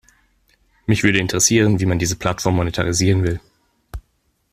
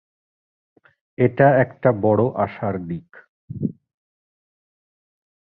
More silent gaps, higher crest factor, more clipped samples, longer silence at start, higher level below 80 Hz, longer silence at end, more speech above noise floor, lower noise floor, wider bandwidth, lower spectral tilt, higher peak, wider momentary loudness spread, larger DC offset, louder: second, none vs 3.29-3.48 s; about the same, 18 dB vs 22 dB; neither; second, 0.9 s vs 1.2 s; first, -42 dBFS vs -54 dBFS; second, 0.55 s vs 1.85 s; second, 48 dB vs over 71 dB; second, -66 dBFS vs under -90 dBFS; first, 15 kHz vs 4.5 kHz; second, -4.5 dB/octave vs -12.5 dB/octave; about the same, -2 dBFS vs -2 dBFS; first, 22 LU vs 15 LU; neither; about the same, -18 LUFS vs -20 LUFS